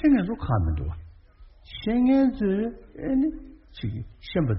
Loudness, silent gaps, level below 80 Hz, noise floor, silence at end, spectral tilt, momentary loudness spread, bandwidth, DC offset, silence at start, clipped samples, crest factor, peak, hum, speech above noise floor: -26 LUFS; none; -38 dBFS; -51 dBFS; 0 s; -7.5 dB/octave; 18 LU; 5.8 kHz; under 0.1%; 0 s; under 0.1%; 14 dB; -10 dBFS; none; 26 dB